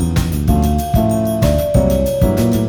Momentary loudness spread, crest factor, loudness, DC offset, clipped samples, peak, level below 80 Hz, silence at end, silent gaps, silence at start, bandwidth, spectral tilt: 2 LU; 12 dB; -15 LUFS; under 0.1%; under 0.1%; -2 dBFS; -22 dBFS; 0 s; none; 0 s; over 20 kHz; -7 dB/octave